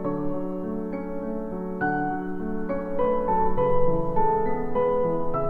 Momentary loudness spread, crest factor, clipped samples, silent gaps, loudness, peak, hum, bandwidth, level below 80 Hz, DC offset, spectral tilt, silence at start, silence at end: 8 LU; 14 dB; under 0.1%; none; -26 LUFS; -10 dBFS; none; 3.2 kHz; -36 dBFS; under 0.1%; -10 dB/octave; 0 s; 0 s